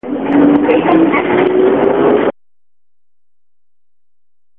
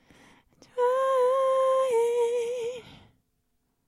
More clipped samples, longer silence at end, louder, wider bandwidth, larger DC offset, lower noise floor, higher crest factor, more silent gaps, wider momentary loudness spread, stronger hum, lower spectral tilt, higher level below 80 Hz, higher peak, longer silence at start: neither; first, 2.25 s vs 0.95 s; first, -11 LUFS vs -25 LUFS; second, 3.9 kHz vs 14 kHz; first, 0.5% vs under 0.1%; first, -89 dBFS vs -74 dBFS; about the same, 14 dB vs 12 dB; neither; second, 4 LU vs 12 LU; neither; first, -10 dB/octave vs -2.5 dB/octave; first, -48 dBFS vs -72 dBFS; first, 0 dBFS vs -16 dBFS; second, 0.05 s vs 0.75 s